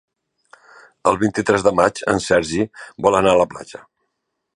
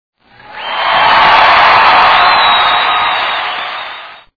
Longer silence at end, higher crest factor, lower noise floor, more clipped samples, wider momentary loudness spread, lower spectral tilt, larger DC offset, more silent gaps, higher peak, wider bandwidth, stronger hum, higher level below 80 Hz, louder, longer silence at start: first, 0.8 s vs 0.2 s; first, 20 dB vs 10 dB; first, -76 dBFS vs -31 dBFS; second, under 0.1% vs 0.8%; second, 9 LU vs 16 LU; first, -5 dB/octave vs -3 dB/octave; neither; neither; about the same, 0 dBFS vs 0 dBFS; first, 11 kHz vs 5.4 kHz; neither; second, -48 dBFS vs -42 dBFS; second, -18 LUFS vs -7 LUFS; first, 1.05 s vs 0.5 s